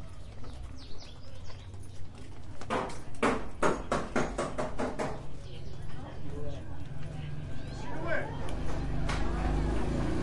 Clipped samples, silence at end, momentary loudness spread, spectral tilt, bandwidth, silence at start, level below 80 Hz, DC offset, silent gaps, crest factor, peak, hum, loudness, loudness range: under 0.1%; 0 s; 16 LU; -6 dB/octave; 11.5 kHz; 0 s; -40 dBFS; under 0.1%; none; 18 dB; -14 dBFS; none; -35 LUFS; 7 LU